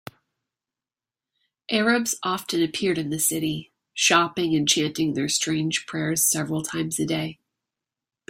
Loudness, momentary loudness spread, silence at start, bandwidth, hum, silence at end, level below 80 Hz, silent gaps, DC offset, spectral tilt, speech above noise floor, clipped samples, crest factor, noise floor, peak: -23 LUFS; 7 LU; 1.7 s; 16 kHz; none; 0.95 s; -64 dBFS; none; under 0.1%; -3 dB/octave; over 66 dB; under 0.1%; 22 dB; under -90 dBFS; -4 dBFS